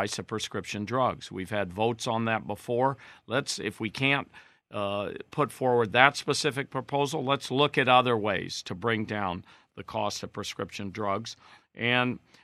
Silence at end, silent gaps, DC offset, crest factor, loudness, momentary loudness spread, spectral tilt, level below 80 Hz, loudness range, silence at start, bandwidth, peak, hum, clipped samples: 0.25 s; none; under 0.1%; 28 dB; -28 LUFS; 13 LU; -4.5 dB/octave; -70 dBFS; 7 LU; 0 s; 14 kHz; -2 dBFS; none; under 0.1%